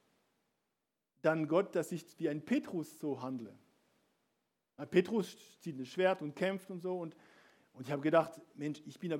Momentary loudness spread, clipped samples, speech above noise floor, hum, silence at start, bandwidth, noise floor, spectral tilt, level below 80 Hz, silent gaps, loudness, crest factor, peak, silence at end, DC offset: 14 LU; under 0.1%; 51 dB; none; 1.25 s; 16.5 kHz; -87 dBFS; -6.5 dB/octave; -88 dBFS; none; -36 LUFS; 22 dB; -14 dBFS; 0 s; under 0.1%